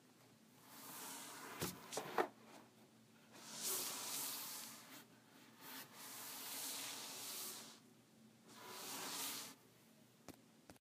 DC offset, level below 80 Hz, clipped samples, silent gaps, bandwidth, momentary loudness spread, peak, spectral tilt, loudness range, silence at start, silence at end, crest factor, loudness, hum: under 0.1%; -88 dBFS; under 0.1%; none; 15.5 kHz; 24 LU; -22 dBFS; -1.5 dB/octave; 4 LU; 0 s; 0.2 s; 30 dB; -47 LUFS; none